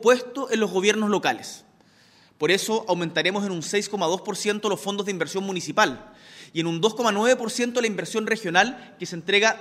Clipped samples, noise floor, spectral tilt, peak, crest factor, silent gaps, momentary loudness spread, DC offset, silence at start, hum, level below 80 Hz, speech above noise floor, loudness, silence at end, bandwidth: under 0.1%; -56 dBFS; -3.5 dB/octave; -4 dBFS; 20 dB; none; 8 LU; under 0.1%; 0 s; none; -68 dBFS; 33 dB; -24 LUFS; 0 s; 16 kHz